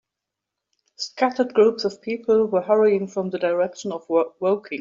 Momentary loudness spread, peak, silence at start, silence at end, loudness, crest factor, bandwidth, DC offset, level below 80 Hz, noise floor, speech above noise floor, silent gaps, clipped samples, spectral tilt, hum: 9 LU; -6 dBFS; 1 s; 0 s; -21 LUFS; 16 dB; 7.4 kHz; under 0.1%; -70 dBFS; -85 dBFS; 63 dB; none; under 0.1%; -5.5 dB/octave; none